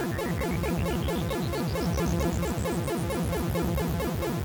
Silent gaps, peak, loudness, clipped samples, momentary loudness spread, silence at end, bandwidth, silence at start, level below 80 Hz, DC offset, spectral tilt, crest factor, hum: none; -14 dBFS; -29 LUFS; under 0.1%; 2 LU; 0 s; over 20 kHz; 0 s; -36 dBFS; under 0.1%; -6 dB/octave; 14 dB; none